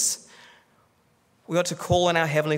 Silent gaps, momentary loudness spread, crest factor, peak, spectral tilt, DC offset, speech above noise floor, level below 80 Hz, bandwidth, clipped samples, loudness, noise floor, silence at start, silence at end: none; 7 LU; 20 dB; -6 dBFS; -3.5 dB/octave; under 0.1%; 41 dB; -54 dBFS; 16 kHz; under 0.1%; -24 LUFS; -64 dBFS; 0 s; 0 s